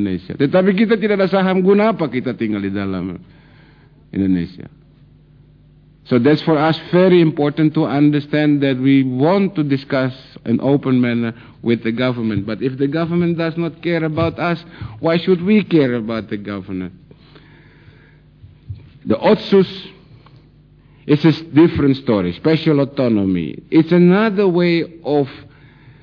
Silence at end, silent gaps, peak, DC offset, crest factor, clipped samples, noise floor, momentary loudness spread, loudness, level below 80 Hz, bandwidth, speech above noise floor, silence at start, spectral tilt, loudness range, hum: 0.6 s; none; -2 dBFS; under 0.1%; 16 dB; under 0.1%; -47 dBFS; 12 LU; -16 LUFS; -50 dBFS; 5.4 kHz; 32 dB; 0 s; -9.5 dB/octave; 8 LU; none